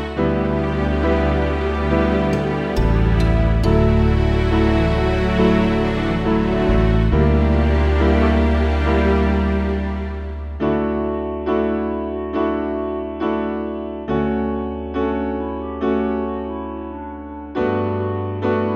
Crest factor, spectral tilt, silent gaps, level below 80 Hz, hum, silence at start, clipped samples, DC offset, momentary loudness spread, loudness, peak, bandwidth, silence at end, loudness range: 14 dB; -8.5 dB/octave; none; -24 dBFS; none; 0 s; under 0.1%; under 0.1%; 9 LU; -19 LUFS; -4 dBFS; 7.4 kHz; 0 s; 6 LU